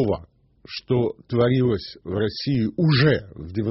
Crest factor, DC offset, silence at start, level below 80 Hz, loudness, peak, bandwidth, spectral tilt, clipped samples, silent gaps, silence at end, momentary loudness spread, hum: 16 dB; under 0.1%; 0 s; -48 dBFS; -22 LUFS; -6 dBFS; 6 kHz; -6 dB/octave; under 0.1%; none; 0 s; 12 LU; none